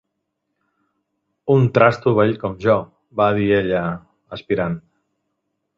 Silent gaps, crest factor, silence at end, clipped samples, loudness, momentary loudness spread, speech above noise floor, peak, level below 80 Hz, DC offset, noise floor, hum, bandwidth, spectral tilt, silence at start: none; 18 dB; 1 s; under 0.1%; -18 LUFS; 16 LU; 58 dB; -2 dBFS; -50 dBFS; under 0.1%; -76 dBFS; none; 7.2 kHz; -8.5 dB/octave; 1.45 s